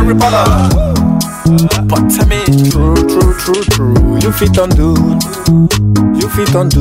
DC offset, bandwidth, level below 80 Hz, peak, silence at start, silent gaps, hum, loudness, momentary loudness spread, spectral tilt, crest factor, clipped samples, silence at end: 0.3%; 16.5 kHz; -18 dBFS; 0 dBFS; 0 s; none; none; -10 LUFS; 3 LU; -6 dB/octave; 8 dB; under 0.1%; 0 s